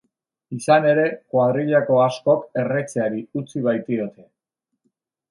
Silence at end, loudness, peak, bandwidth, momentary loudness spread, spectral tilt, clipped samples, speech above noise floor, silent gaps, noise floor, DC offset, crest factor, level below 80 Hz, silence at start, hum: 1.2 s; -20 LUFS; -2 dBFS; 11.5 kHz; 12 LU; -6.5 dB/octave; under 0.1%; 61 dB; none; -80 dBFS; under 0.1%; 18 dB; -70 dBFS; 0.5 s; none